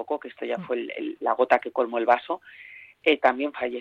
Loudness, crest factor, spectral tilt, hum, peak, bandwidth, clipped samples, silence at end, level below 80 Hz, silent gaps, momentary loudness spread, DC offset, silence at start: -25 LUFS; 20 dB; -5.5 dB/octave; none; -6 dBFS; 7.8 kHz; under 0.1%; 0 s; -70 dBFS; none; 12 LU; under 0.1%; 0 s